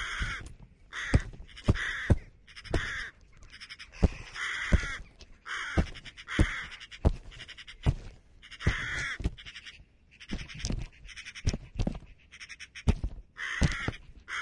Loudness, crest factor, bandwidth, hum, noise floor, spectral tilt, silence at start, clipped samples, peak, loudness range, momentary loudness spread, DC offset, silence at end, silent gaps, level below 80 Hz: -33 LUFS; 26 dB; 11.5 kHz; none; -56 dBFS; -5 dB/octave; 0 s; under 0.1%; -8 dBFS; 5 LU; 18 LU; under 0.1%; 0 s; none; -38 dBFS